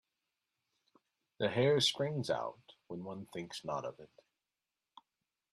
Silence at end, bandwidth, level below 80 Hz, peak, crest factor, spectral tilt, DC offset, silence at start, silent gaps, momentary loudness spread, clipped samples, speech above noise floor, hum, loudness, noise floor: 1.45 s; 13.5 kHz; -76 dBFS; -18 dBFS; 20 dB; -4.5 dB/octave; under 0.1%; 1.4 s; none; 16 LU; under 0.1%; over 54 dB; none; -35 LUFS; under -90 dBFS